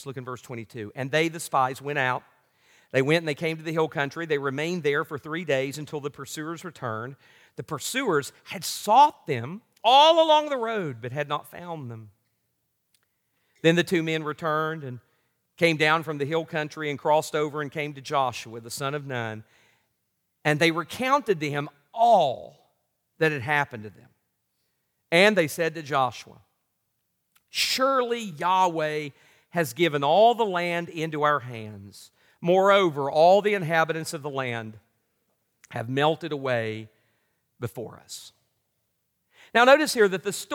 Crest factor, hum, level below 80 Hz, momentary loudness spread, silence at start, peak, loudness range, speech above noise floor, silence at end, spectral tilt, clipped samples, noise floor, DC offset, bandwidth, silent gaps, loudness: 22 dB; none; -76 dBFS; 18 LU; 0 s; -4 dBFS; 8 LU; 52 dB; 0 s; -4.5 dB/octave; under 0.1%; -76 dBFS; under 0.1%; 18.5 kHz; none; -24 LUFS